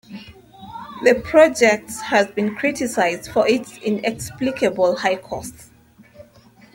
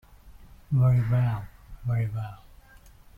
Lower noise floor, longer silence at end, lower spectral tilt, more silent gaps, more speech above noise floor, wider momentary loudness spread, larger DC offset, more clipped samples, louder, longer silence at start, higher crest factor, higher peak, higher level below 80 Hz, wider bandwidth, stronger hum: about the same, -50 dBFS vs -52 dBFS; second, 0.5 s vs 0.8 s; second, -4 dB/octave vs -9.5 dB/octave; neither; about the same, 31 dB vs 28 dB; first, 20 LU vs 15 LU; neither; neither; first, -19 LUFS vs -26 LUFS; second, 0.1 s vs 0.25 s; about the same, 18 dB vs 14 dB; first, -2 dBFS vs -14 dBFS; about the same, -52 dBFS vs -48 dBFS; first, 17 kHz vs 3.5 kHz; neither